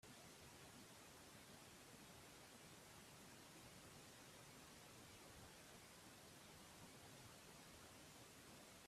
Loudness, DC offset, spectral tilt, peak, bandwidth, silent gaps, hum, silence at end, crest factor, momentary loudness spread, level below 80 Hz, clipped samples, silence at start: -62 LUFS; under 0.1%; -3 dB/octave; -50 dBFS; 15.5 kHz; none; none; 0 s; 14 dB; 1 LU; -80 dBFS; under 0.1%; 0 s